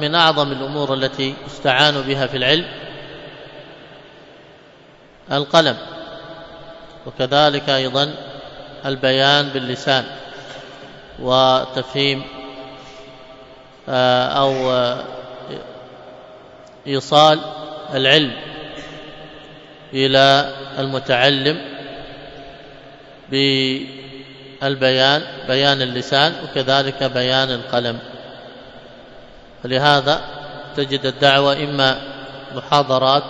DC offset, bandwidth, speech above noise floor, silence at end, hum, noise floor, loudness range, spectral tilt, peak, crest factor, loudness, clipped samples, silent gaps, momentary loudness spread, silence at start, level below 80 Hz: under 0.1%; 11 kHz; 29 dB; 0 s; none; -46 dBFS; 5 LU; -4.5 dB/octave; 0 dBFS; 20 dB; -17 LUFS; under 0.1%; none; 23 LU; 0 s; -52 dBFS